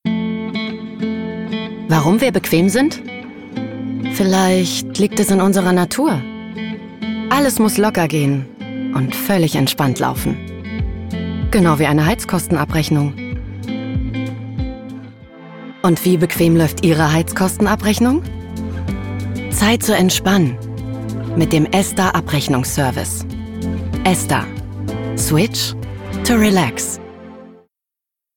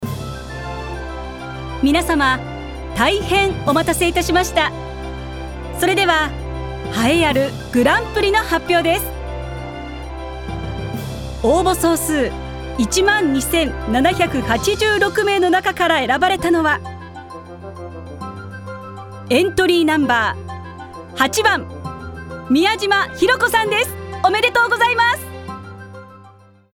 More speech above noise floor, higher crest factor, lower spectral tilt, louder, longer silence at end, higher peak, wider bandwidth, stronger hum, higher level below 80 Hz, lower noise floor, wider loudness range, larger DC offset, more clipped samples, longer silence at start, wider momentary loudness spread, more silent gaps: first, 70 dB vs 30 dB; about the same, 14 dB vs 16 dB; about the same, -5 dB/octave vs -4 dB/octave; about the same, -17 LUFS vs -17 LUFS; first, 0.8 s vs 0.45 s; about the same, -4 dBFS vs -2 dBFS; about the same, 18 kHz vs 18 kHz; neither; about the same, -36 dBFS vs -34 dBFS; first, -85 dBFS vs -46 dBFS; about the same, 3 LU vs 4 LU; neither; neither; about the same, 0.05 s vs 0 s; second, 13 LU vs 17 LU; neither